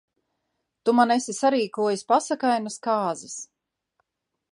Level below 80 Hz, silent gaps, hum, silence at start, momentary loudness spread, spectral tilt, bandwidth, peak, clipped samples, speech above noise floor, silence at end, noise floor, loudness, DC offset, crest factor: -80 dBFS; none; none; 0.85 s; 13 LU; -3.5 dB/octave; 11.5 kHz; -4 dBFS; under 0.1%; 55 dB; 1.1 s; -78 dBFS; -24 LUFS; under 0.1%; 20 dB